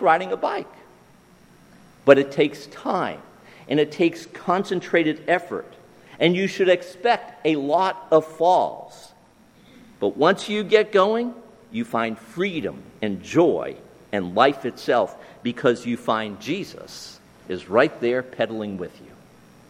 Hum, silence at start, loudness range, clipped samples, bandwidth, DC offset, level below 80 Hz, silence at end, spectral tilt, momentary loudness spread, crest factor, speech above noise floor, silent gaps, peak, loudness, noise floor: none; 0 s; 3 LU; under 0.1%; 15 kHz; under 0.1%; -64 dBFS; 0.8 s; -5.5 dB/octave; 14 LU; 22 dB; 32 dB; none; 0 dBFS; -22 LUFS; -53 dBFS